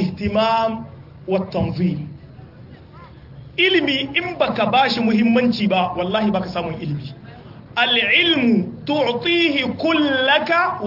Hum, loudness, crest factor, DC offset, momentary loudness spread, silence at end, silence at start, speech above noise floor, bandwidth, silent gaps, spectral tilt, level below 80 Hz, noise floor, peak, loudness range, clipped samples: none; -18 LUFS; 16 dB; under 0.1%; 13 LU; 0 s; 0 s; 23 dB; 5.8 kHz; none; -6.5 dB/octave; -50 dBFS; -41 dBFS; -2 dBFS; 6 LU; under 0.1%